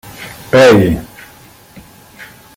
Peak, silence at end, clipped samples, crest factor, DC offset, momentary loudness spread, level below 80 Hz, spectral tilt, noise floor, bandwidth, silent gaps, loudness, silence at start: 0 dBFS; 0.3 s; under 0.1%; 14 dB; under 0.1%; 23 LU; -38 dBFS; -6 dB/octave; -41 dBFS; 16.5 kHz; none; -10 LUFS; 0.2 s